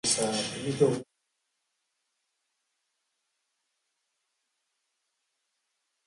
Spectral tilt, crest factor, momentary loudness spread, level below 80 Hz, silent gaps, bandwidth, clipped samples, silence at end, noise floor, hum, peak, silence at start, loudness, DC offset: -3.5 dB/octave; 24 dB; 7 LU; -70 dBFS; none; 12 kHz; under 0.1%; 5.05 s; -81 dBFS; none; -12 dBFS; 0.05 s; -28 LUFS; under 0.1%